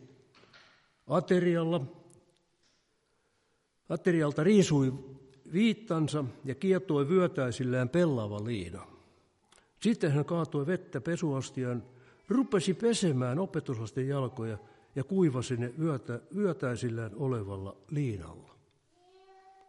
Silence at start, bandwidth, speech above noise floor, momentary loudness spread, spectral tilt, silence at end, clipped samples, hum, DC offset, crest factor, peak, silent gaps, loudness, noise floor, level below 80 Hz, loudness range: 0 s; 11.5 kHz; 44 dB; 12 LU; -6.5 dB/octave; 1.25 s; under 0.1%; none; under 0.1%; 20 dB; -12 dBFS; none; -31 LUFS; -74 dBFS; -68 dBFS; 5 LU